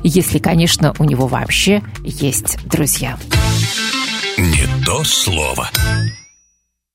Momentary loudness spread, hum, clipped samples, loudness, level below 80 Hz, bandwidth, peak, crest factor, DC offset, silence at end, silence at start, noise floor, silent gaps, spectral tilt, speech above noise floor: 5 LU; none; under 0.1%; -15 LUFS; -28 dBFS; 16.5 kHz; 0 dBFS; 16 dB; under 0.1%; 0.75 s; 0 s; -63 dBFS; none; -4 dB/octave; 48 dB